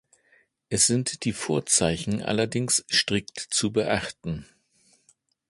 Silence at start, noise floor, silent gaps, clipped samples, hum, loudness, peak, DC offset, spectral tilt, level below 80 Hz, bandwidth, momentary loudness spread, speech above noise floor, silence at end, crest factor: 0.7 s; -65 dBFS; none; under 0.1%; none; -24 LUFS; -6 dBFS; under 0.1%; -3 dB/octave; -52 dBFS; 12 kHz; 10 LU; 40 dB; 1.05 s; 20 dB